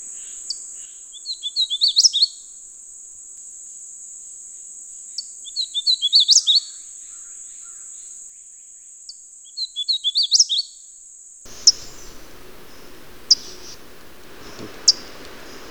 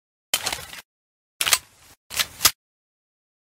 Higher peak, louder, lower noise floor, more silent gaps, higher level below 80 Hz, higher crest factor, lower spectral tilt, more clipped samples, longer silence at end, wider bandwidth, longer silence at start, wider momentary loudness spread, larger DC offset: about the same, 0 dBFS vs 0 dBFS; first, -17 LUFS vs -22 LUFS; second, -44 dBFS vs under -90 dBFS; second, none vs 0.85-1.40 s, 1.97-2.10 s; about the same, -56 dBFS vs -56 dBFS; about the same, 24 dB vs 28 dB; about the same, 2 dB/octave vs 1 dB/octave; neither; second, 0 s vs 1.05 s; first, over 20 kHz vs 16.5 kHz; second, 0 s vs 0.35 s; first, 25 LU vs 14 LU; neither